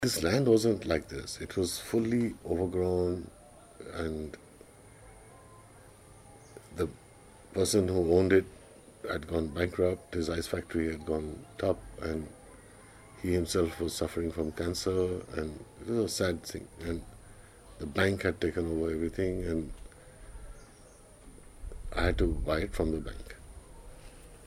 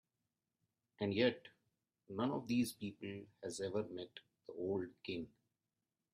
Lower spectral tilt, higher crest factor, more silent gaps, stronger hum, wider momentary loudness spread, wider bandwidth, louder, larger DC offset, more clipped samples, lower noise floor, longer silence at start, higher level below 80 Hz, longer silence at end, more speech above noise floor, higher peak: about the same, -5.5 dB/octave vs -5.5 dB/octave; about the same, 22 dB vs 22 dB; neither; neither; first, 24 LU vs 17 LU; first, 16 kHz vs 14 kHz; first, -32 LUFS vs -42 LUFS; neither; neither; second, -54 dBFS vs under -90 dBFS; second, 0 s vs 1 s; first, -46 dBFS vs -80 dBFS; second, 0 s vs 0.85 s; second, 24 dB vs over 49 dB; first, -10 dBFS vs -22 dBFS